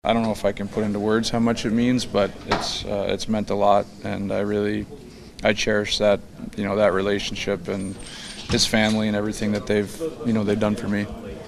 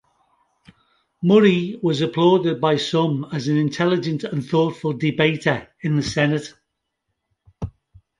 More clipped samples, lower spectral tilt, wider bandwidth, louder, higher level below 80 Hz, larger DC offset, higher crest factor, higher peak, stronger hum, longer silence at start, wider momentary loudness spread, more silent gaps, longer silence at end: neither; second, -4.5 dB/octave vs -6.5 dB/octave; first, 14 kHz vs 11 kHz; second, -23 LUFS vs -20 LUFS; first, -44 dBFS vs -52 dBFS; neither; about the same, 20 dB vs 18 dB; about the same, -2 dBFS vs -2 dBFS; neither; second, 0.05 s vs 1.2 s; about the same, 10 LU vs 9 LU; neither; second, 0 s vs 0.5 s